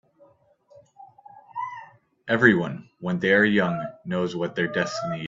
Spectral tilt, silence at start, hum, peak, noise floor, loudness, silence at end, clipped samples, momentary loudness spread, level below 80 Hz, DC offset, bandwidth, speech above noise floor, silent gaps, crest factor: -6 dB/octave; 1 s; none; -2 dBFS; -58 dBFS; -23 LUFS; 0 s; under 0.1%; 16 LU; -64 dBFS; under 0.1%; 7.8 kHz; 35 dB; none; 24 dB